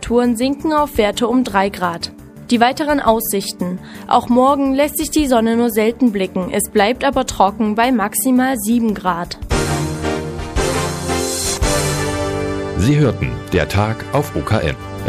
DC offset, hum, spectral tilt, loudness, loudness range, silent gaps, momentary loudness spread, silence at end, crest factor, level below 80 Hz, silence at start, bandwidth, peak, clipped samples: under 0.1%; none; -5 dB/octave; -17 LUFS; 3 LU; none; 7 LU; 0 s; 16 dB; -32 dBFS; 0 s; 15.5 kHz; 0 dBFS; under 0.1%